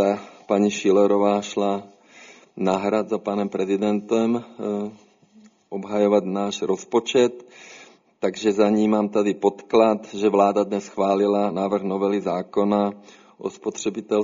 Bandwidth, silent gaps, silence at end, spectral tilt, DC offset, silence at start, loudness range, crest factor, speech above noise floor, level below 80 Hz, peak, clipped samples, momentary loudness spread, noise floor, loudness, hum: 7.6 kHz; none; 0 s; -5.5 dB/octave; under 0.1%; 0 s; 4 LU; 18 dB; 32 dB; -66 dBFS; -4 dBFS; under 0.1%; 11 LU; -53 dBFS; -22 LUFS; none